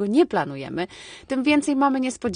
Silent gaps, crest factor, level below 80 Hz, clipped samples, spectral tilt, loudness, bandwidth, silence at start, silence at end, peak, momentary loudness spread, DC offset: none; 16 dB; -58 dBFS; under 0.1%; -5 dB/octave; -23 LUFS; 10 kHz; 0 s; 0 s; -8 dBFS; 11 LU; under 0.1%